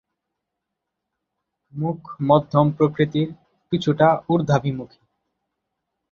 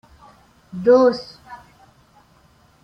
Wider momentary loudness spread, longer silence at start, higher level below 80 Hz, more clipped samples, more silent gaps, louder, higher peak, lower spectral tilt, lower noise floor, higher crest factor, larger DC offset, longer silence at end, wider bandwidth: second, 11 LU vs 27 LU; first, 1.75 s vs 0.75 s; about the same, -58 dBFS vs -58 dBFS; neither; neither; second, -21 LUFS vs -17 LUFS; about the same, -2 dBFS vs -4 dBFS; first, -8 dB/octave vs -6.5 dB/octave; first, -81 dBFS vs -55 dBFS; about the same, 20 dB vs 18 dB; neither; about the same, 1.25 s vs 1.3 s; about the same, 7 kHz vs 6.4 kHz